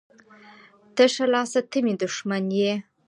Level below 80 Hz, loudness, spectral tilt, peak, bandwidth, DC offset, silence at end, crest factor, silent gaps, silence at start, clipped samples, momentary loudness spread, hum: -76 dBFS; -23 LUFS; -4.5 dB/octave; -6 dBFS; 11.5 kHz; under 0.1%; 0.25 s; 20 dB; none; 0.95 s; under 0.1%; 7 LU; none